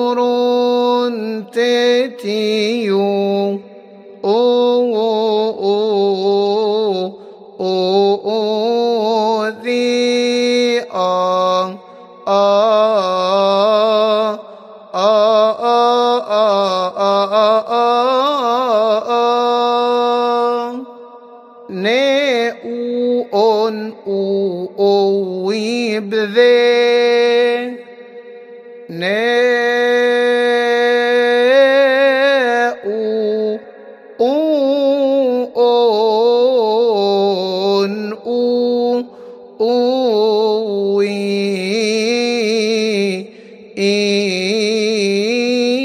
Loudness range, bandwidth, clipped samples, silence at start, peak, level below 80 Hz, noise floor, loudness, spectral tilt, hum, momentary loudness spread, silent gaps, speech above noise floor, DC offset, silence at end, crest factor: 3 LU; 11 kHz; under 0.1%; 0 s; 0 dBFS; -74 dBFS; -38 dBFS; -15 LUFS; -4.5 dB/octave; none; 8 LU; none; 24 dB; under 0.1%; 0 s; 14 dB